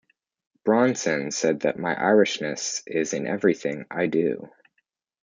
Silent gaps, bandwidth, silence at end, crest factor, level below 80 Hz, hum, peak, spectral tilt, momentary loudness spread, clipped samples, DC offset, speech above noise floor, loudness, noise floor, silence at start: none; 9.6 kHz; 0.75 s; 18 dB; -70 dBFS; none; -6 dBFS; -4 dB/octave; 8 LU; under 0.1%; under 0.1%; 51 dB; -24 LUFS; -74 dBFS; 0.65 s